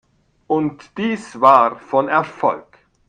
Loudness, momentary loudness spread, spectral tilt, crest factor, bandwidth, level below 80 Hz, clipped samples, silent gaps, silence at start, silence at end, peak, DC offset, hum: -17 LUFS; 12 LU; -6.5 dB/octave; 18 dB; 9.6 kHz; -62 dBFS; under 0.1%; none; 0.5 s; 0.5 s; 0 dBFS; under 0.1%; none